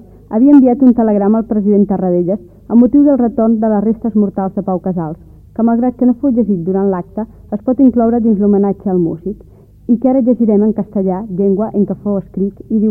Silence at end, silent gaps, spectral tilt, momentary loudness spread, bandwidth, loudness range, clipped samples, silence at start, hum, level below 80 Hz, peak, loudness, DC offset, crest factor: 0 s; none; -13 dB/octave; 11 LU; 2.4 kHz; 4 LU; under 0.1%; 0.3 s; none; -42 dBFS; 0 dBFS; -13 LUFS; under 0.1%; 12 dB